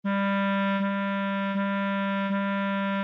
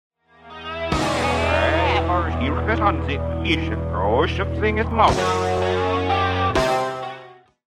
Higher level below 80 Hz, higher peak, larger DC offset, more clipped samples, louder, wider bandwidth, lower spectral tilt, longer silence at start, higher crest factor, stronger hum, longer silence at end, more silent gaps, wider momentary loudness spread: second, -82 dBFS vs -32 dBFS; second, -18 dBFS vs -2 dBFS; neither; neither; second, -27 LUFS vs -21 LUFS; second, 4.8 kHz vs 12.5 kHz; first, -8.5 dB/octave vs -5.5 dB/octave; second, 0.05 s vs 0.45 s; second, 8 dB vs 18 dB; neither; second, 0 s vs 0.4 s; neither; second, 3 LU vs 9 LU